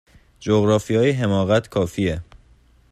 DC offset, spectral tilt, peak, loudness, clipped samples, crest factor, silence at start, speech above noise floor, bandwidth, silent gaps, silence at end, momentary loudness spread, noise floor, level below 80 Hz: under 0.1%; -6.5 dB/octave; -4 dBFS; -20 LUFS; under 0.1%; 16 dB; 0.4 s; 35 dB; 14 kHz; none; 0.7 s; 7 LU; -54 dBFS; -48 dBFS